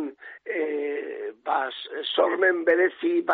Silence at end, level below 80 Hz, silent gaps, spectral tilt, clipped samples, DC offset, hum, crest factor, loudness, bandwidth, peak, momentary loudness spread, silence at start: 0 s; -76 dBFS; none; 0.5 dB/octave; under 0.1%; under 0.1%; none; 16 dB; -25 LUFS; 4.6 kHz; -8 dBFS; 13 LU; 0 s